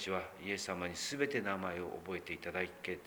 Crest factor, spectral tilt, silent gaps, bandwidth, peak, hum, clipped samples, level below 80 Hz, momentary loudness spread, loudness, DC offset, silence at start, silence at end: 18 dB; -3.5 dB/octave; none; over 20 kHz; -22 dBFS; none; under 0.1%; -68 dBFS; 7 LU; -39 LUFS; under 0.1%; 0 s; 0 s